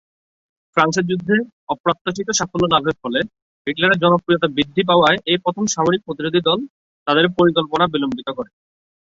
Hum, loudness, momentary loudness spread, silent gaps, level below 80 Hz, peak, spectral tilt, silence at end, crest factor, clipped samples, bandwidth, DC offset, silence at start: none; -18 LUFS; 12 LU; 1.52-1.67 s, 1.80-1.84 s, 2.01-2.05 s, 3.42-3.65 s, 6.70-7.06 s; -54 dBFS; -2 dBFS; -4 dB/octave; 0.65 s; 18 dB; under 0.1%; 7.8 kHz; under 0.1%; 0.75 s